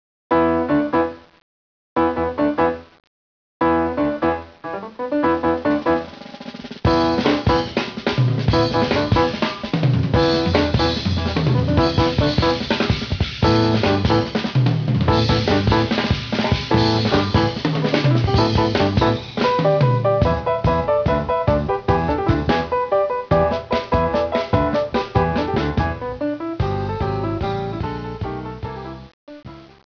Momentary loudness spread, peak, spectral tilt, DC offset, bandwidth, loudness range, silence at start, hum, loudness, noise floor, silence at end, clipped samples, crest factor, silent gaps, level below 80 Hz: 9 LU; -2 dBFS; -7 dB/octave; under 0.1%; 5.4 kHz; 4 LU; 0.3 s; none; -19 LUFS; under -90 dBFS; 0.35 s; under 0.1%; 18 dB; 1.42-1.96 s, 3.07-3.60 s, 29.13-29.27 s; -34 dBFS